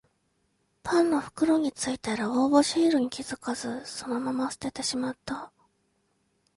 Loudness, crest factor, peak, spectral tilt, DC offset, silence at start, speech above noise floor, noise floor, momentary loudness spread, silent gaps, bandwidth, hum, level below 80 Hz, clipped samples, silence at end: -27 LUFS; 20 dB; -8 dBFS; -3.5 dB/octave; under 0.1%; 0.85 s; 46 dB; -73 dBFS; 13 LU; none; 11.5 kHz; none; -64 dBFS; under 0.1%; 1.1 s